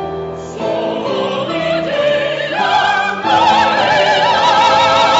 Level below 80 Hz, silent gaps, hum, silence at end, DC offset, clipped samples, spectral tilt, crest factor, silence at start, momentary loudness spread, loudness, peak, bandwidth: -48 dBFS; none; none; 0 s; under 0.1%; under 0.1%; -3.5 dB/octave; 12 dB; 0 s; 9 LU; -13 LUFS; -2 dBFS; 8 kHz